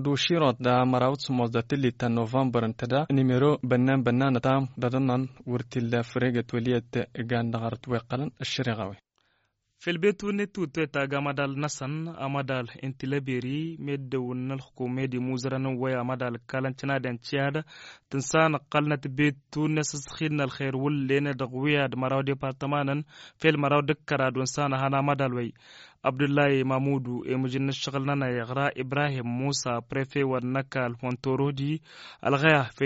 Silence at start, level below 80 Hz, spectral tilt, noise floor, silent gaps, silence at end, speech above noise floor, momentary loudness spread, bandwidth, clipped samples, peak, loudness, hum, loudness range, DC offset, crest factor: 0 s; -62 dBFS; -5.5 dB/octave; -73 dBFS; none; 0 s; 46 dB; 9 LU; 8 kHz; under 0.1%; -6 dBFS; -28 LUFS; none; 5 LU; under 0.1%; 22 dB